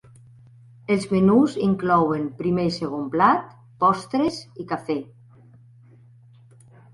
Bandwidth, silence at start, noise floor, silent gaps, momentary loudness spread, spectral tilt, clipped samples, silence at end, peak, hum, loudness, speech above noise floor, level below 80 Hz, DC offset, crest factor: 11.5 kHz; 0.9 s; -51 dBFS; none; 12 LU; -7 dB/octave; under 0.1%; 1.9 s; -4 dBFS; none; -22 LUFS; 30 dB; -56 dBFS; under 0.1%; 18 dB